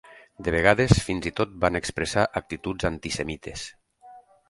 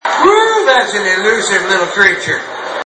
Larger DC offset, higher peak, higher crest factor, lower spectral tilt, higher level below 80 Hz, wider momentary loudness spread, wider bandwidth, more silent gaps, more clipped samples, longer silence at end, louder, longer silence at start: neither; about the same, 0 dBFS vs 0 dBFS; first, 26 dB vs 12 dB; first, -5 dB/octave vs -2 dB/octave; first, -40 dBFS vs -52 dBFS; first, 13 LU vs 8 LU; first, 11.5 kHz vs 8.8 kHz; neither; neither; first, 0.3 s vs 0.05 s; second, -25 LUFS vs -11 LUFS; about the same, 0.1 s vs 0.05 s